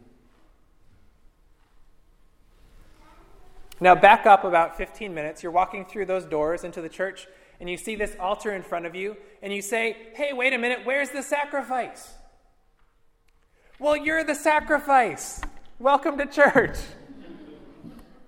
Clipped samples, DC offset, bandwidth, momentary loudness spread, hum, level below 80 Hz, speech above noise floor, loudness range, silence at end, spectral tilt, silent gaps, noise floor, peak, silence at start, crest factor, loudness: under 0.1%; under 0.1%; 16 kHz; 18 LU; none; -48 dBFS; 38 dB; 9 LU; 0.25 s; -4 dB/octave; none; -61 dBFS; 0 dBFS; 3.4 s; 24 dB; -23 LUFS